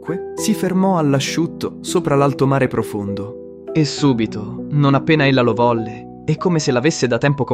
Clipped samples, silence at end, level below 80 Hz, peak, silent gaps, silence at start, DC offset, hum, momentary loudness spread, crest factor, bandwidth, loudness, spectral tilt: under 0.1%; 0 s; -50 dBFS; -2 dBFS; none; 0 s; under 0.1%; none; 11 LU; 16 dB; 15.5 kHz; -17 LUFS; -6 dB/octave